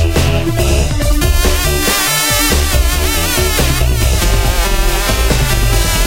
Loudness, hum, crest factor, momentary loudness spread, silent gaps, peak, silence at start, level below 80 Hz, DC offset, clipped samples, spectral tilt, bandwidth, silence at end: -13 LUFS; none; 12 dB; 3 LU; none; 0 dBFS; 0 s; -14 dBFS; under 0.1%; under 0.1%; -3.5 dB/octave; 17 kHz; 0 s